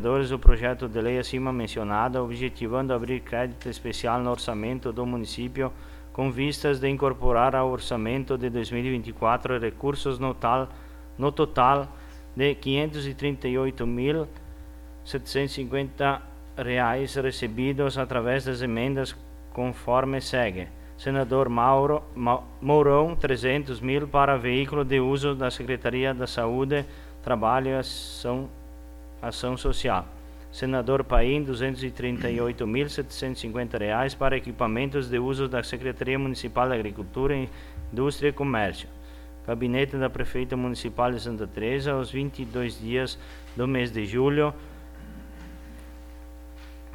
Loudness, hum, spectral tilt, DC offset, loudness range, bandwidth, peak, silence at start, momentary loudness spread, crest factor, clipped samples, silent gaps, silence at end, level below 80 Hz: -27 LUFS; none; -6.5 dB/octave; under 0.1%; 5 LU; 16.5 kHz; 0 dBFS; 0 s; 17 LU; 26 dB; under 0.1%; none; 0 s; -36 dBFS